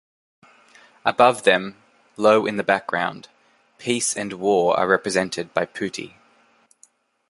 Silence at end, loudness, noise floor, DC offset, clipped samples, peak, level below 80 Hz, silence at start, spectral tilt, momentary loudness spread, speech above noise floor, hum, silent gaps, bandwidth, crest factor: 1.2 s; -21 LUFS; -59 dBFS; under 0.1%; under 0.1%; 0 dBFS; -64 dBFS; 1.05 s; -3.5 dB/octave; 13 LU; 38 dB; none; none; 11.5 kHz; 22 dB